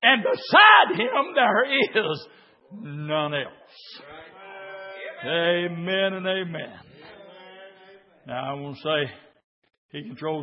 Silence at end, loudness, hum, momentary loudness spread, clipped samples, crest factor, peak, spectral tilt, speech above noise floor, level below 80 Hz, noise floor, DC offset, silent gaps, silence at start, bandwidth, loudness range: 0 s; -21 LUFS; none; 25 LU; under 0.1%; 22 dB; -2 dBFS; -8.5 dB/octave; 29 dB; -74 dBFS; -52 dBFS; under 0.1%; 9.44-9.62 s, 9.78-9.89 s; 0 s; 5.8 kHz; 14 LU